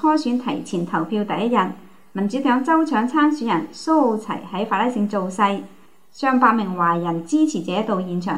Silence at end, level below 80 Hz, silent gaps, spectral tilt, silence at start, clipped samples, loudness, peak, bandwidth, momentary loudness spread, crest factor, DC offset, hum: 0 s; -70 dBFS; none; -6 dB/octave; 0 s; under 0.1%; -20 LUFS; -2 dBFS; 11 kHz; 8 LU; 18 dB; 0.5%; none